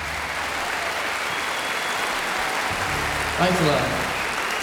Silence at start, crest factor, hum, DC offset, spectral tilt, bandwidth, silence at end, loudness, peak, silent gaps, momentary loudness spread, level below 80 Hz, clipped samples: 0 s; 18 dB; none; under 0.1%; -3 dB/octave; over 20 kHz; 0 s; -23 LUFS; -6 dBFS; none; 5 LU; -44 dBFS; under 0.1%